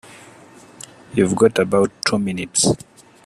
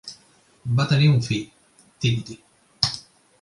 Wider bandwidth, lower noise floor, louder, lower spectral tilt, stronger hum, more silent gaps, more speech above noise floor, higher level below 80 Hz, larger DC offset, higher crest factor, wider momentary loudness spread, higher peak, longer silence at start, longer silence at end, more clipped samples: first, 14 kHz vs 11.5 kHz; second, -45 dBFS vs -57 dBFS; first, -18 LUFS vs -22 LUFS; second, -4 dB/octave vs -5.5 dB/octave; neither; neither; second, 27 dB vs 37 dB; about the same, -52 dBFS vs -54 dBFS; neither; about the same, 20 dB vs 22 dB; about the same, 21 LU vs 22 LU; about the same, 0 dBFS vs -2 dBFS; about the same, 0.1 s vs 0.05 s; about the same, 0.5 s vs 0.4 s; neither